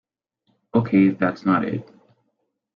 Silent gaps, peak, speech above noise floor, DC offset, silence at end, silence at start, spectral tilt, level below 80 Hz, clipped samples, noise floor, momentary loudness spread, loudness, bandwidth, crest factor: none; -6 dBFS; 54 dB; under 0.1%; 0.9 s; 0.75 s; -9.5 dB/octave; -62 dBFS; under 0.1%; -74 dBFS; 10 LU; -21 LUFS; 5.4 kHz; 18 dB